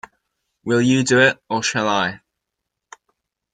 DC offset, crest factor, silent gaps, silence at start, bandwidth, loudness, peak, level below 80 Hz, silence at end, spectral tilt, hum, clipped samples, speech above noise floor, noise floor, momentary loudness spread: under 0.1%; 18 dB; none; 0.65 s; 9.4 kHz; -18 LUFS; -2 dBFS; -60 dBFS; 1.35 s; -4 dB/octave; none; under 0.1%; 63 dB; -81 dBFS; 8 LU